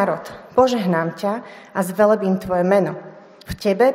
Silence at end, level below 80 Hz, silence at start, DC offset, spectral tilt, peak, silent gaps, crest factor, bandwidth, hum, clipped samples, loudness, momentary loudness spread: 0 s; -50 dBFS; 0 s; under 0.1%; -6.5 dB/octave; -2 dBFS; none; 18 dB; 16 kHz; none; under 0.1%; -20 LUFS; 12 LU